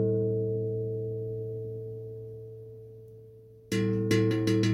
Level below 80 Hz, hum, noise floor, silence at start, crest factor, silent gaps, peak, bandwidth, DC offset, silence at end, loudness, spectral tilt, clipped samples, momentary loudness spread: -60 dBFS; none; -51 dBFS; 0 s; 18 dB; none; -12 dBFS; 15.5 kHz; under 0.1%; 0 s; -30 LUFS; -7 dB/octave; under 0.1%; 21 LU